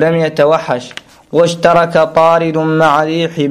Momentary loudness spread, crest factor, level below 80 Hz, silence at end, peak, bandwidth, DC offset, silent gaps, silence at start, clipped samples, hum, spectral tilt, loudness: 9 LU; 12 dB; -50 dBFS; 0 s; 0 dBFS; 13 kHz; under 0.1%; none; 0 s; under 0.1%; none; -6 dB/octave; -11 LUFS